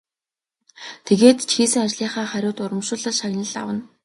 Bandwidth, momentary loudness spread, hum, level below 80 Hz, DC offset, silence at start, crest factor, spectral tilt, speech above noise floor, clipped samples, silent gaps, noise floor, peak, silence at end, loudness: 11.5 kHz; 14 LU; none; -66 dBFS; under 0.1%; 0.8 s; 20 dB; -3.5 dB/octave; over 70 dB; under 0.1%; none; under -90 dBFS; 0 dBFS; 0.2 s; -20 LUFS